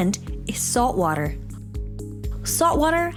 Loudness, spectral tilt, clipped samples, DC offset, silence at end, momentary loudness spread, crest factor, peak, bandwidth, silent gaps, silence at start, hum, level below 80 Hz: -23 LUFS; -4.5 dB/octave; under 0.1%; under 0.1%; 0 s; 15 LU; 16 dB; -8 dBFS; 19 kHz; none; 0 s; none; -34 dBFS